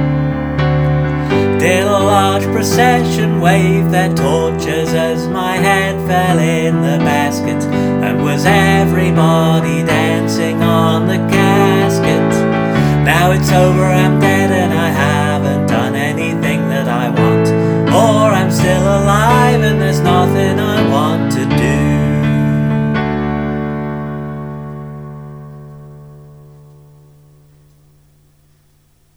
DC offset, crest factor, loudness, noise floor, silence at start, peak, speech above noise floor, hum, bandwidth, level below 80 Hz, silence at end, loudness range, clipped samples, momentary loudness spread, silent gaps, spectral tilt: under 0.1%; 12 dB; -13 LUFS; -53 dBFS; 0 s; 0 dBFS; 42 dB; 50 Hz at -45 dBFS; over 20 kHz; -34 dBFS; 2.95 s; 6 LU; under 0.1%; 6 LU; none; -6 dB/octave